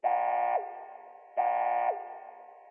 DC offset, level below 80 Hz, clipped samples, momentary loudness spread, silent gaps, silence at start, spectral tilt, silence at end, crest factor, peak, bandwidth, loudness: under 0.1%; under -90 dBFS; under 0.1%; 20 LU; none; 0 s; 1.5 dB/octave; 0 s; 14 dB; -18 dBFS; 3.3 kHz; -30 LUFS